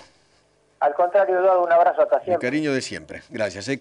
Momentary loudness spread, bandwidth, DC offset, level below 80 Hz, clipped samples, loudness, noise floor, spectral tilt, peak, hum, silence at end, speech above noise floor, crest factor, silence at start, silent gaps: 11 LU; 11 kHz; under 0.1%; -64 dBFS; under 0.1%; -20 LUFS; -61 dBFS; -5 dB/octave; -8 dBFS; 50 Hz at -60 dBFS; 0 s; 41 dB; 12 dB; 0.8 s; none